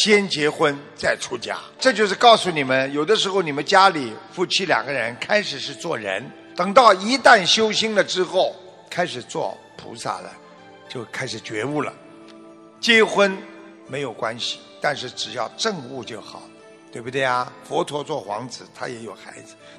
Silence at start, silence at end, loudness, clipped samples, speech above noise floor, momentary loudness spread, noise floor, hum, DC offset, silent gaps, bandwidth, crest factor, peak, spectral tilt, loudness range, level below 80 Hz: 0 s; 0 s; -20 LUFS; under 0.1%; 24 dB; 19 LU; -45 dBFS; none; under 0.1%; none; 12 kHz; 22 dB; 0 dBFS; -3 dB/octave; 10 LU; -66 dBFS